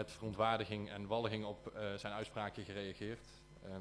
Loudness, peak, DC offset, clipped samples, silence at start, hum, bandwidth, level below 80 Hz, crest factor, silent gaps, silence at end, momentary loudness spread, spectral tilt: -42 LUFS; -20 dBFS; under 0.1%; under 0.1%; 0 s; none; 11 kHz; -66 dBFS; 22 dB; none; 0 s; 14 LU; -5.5 dB/octave